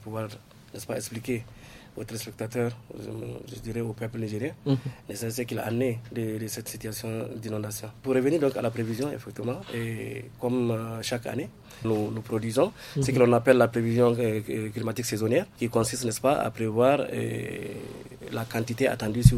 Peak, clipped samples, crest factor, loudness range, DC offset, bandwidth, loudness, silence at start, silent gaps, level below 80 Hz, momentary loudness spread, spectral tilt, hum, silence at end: -2 dBFS; under 0.1%; 26 dB; 10 LU; under 0.1%; 16 kHz; -28 LUFS; 0 s; none; -46 dBFS; 15 LU; -6 dB/octave; none; 0 s